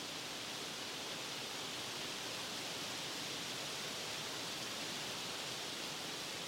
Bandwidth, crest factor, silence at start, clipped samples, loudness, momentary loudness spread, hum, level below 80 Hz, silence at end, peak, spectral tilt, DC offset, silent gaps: 16 kHz; 14 dB; 0 s; under 0.1%; -41 LUFS; 1 LU; none; -76 dBFS; 0 s; -30 dBFS; -1.5 dB/octave; under 0.1%; none